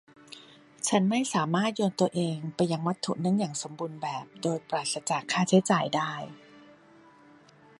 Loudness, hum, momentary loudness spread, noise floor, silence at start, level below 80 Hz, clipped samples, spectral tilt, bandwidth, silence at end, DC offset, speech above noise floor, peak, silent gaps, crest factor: -28 LUFS; none; 13 LU; -56 dBFS; 0.3 s; -72 dBFS; under 0.1%; -5 dB/octave; 11.5 kHz; 1.2 s; under 0.1%; 28 dB; -8 dBFS; none; 20 dB